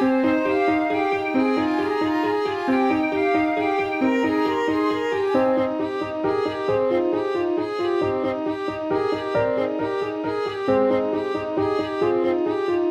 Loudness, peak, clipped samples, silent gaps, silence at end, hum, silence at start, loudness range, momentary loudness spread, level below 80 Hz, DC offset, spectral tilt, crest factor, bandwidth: -22 LUFS; -8 dBFS; under 0.1%; none; 0 s; none; 0 s; 2 LU; 5 LU; -56 dBFS; under 0.1%; -6.5 dB/octave; 14 dB; 9.2 kHz